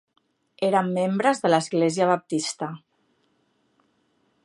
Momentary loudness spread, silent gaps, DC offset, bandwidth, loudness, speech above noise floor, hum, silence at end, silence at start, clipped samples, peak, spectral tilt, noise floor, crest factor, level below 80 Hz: 11 LU; none; under 0.1%; 11.5 kHz; -23 LUFS; 46 dB; none; 1.7 s; 0.6 s; under 0.1%; -4 dBFS; -5 dB/octave; -68 dBFS; 22 dB; -76 dBFS